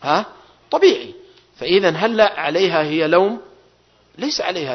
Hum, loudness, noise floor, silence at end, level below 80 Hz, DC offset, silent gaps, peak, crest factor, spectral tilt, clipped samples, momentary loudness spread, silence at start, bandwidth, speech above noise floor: 60 Hz at -55 dBFS; -17 LUFS; -55 dBFS; 0 s; -60 dBFS; under 0.1%; none; -2 dBFS; 18 dB; -4.5 dB/octave; under 0.1%; 13 LU; 0 s; 6.4 kHz; 38 dB